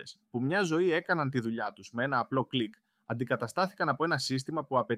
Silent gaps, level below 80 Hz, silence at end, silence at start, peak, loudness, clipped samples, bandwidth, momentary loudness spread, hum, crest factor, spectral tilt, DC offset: none; -76 dBFS; 0 s; 0 s; -14 dBFS; -31 LUFS; under 0.1%; 14.5 kHz; 9 LU; none; 18 dB; -5.5 dB/octave; under 0.1%